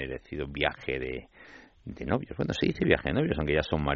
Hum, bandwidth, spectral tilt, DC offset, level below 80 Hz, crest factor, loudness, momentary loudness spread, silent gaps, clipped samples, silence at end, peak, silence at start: none; 7.4 kHz; -4.5 dB/octave; under 0.1%; -46 dBFS; 24 dB; -29 LUFS; 15 LU; none; under 0.1%; 0 s; -6 dBFS; 0 s